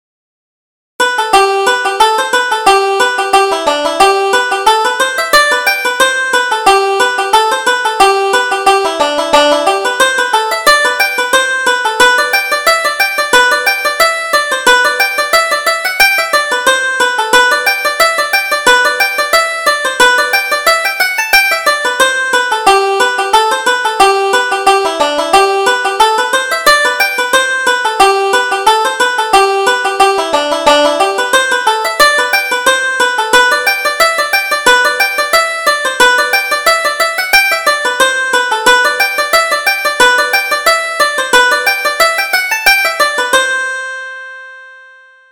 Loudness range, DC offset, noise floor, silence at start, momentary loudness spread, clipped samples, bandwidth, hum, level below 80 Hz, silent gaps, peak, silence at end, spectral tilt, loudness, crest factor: 1 LU; under 0.1%; -40 dBFS; 1 s; 4 LU; 0.2%; over 20 kHz; none; -46 dBFS; none; 0 dBFS; 0.55 s; 0 dB/octave; -10 LUFS; 10 dB